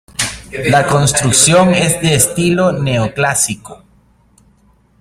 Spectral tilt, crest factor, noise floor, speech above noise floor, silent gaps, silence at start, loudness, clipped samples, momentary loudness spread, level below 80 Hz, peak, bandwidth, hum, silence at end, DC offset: -3.5 dB/octave; 14 dB; -52 dBFS; 39 dB; none; 0.2 s; -12 LUFS; under 0.1%; 11 LU; -40 dBFS; 0 dBFS; 16.5 kHz; none; 1.25 s; under 0.1%